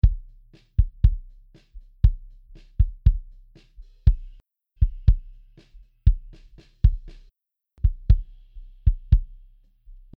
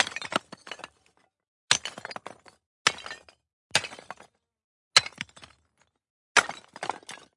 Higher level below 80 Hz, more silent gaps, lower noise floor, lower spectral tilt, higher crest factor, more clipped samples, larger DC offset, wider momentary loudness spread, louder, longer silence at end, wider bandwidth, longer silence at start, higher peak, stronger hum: first, -24 dBFS vs -72 dBFS; second, none vs 1.48-1.68 s, 2.66-2.85 s, 3.53-3.70 s, 4.64-4.91 s, 6.10-6.35 s; second, -64 dBFS vs -71 dBFS; first, -10 dB/octave vs 0 dB/octave; second, 20 dB vs 30 dB; neither; neither; second, 16 LU vs 22 LU; about the same, -25 LUFS vs -26 LUFS; first, 0.9 s vs 0.2 s; second, 4.1 kHz vs 11.5 kHz; about the same, 0.05 s vs 0 s; about the same, -4 dBFS vs -2 dBFS; neither